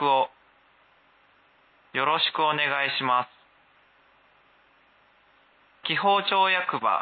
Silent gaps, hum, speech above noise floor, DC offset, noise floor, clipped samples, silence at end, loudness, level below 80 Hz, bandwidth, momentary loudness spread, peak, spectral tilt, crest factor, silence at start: none; none; 37 dB; under 0.1%; -61 dBFS; under 0.1%; 0 s; -24 LUFS; -80 dBFS; 4.8 kHz; 10 LU; -10 dBFS; -7.5 dB/octave; 18 dB; 0 s